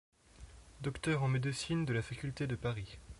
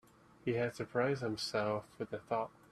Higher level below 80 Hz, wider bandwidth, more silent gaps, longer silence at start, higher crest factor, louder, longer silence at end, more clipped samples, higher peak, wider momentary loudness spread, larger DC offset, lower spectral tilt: first, -56 dBFS vs -72 dBFS; second, 11.5 kHz vs 13.5 kHz; neither; about the same, 0.4 s vs 0.45 s; about the same, 18 dB vs 18 dB; about the same, -37 LUFS vs -38 LUFS; second, 0 s vs 0.2 s; neither; about the same, -20 dBFS vs -20 dBFS; first, 17 LU vs 8 LU; neither; about the same, -6 dB/octave vs -5.5 dB/octave